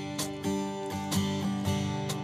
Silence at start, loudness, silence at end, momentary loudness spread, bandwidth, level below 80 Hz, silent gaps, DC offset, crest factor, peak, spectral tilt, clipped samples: 0 s; -32 LUFS; 0 s; 4 LU; 15.5 kHz; -60 dBFS; none; under 0.1%; 16 dB; -16 dBFS; -5 dB/octave; under 0.1%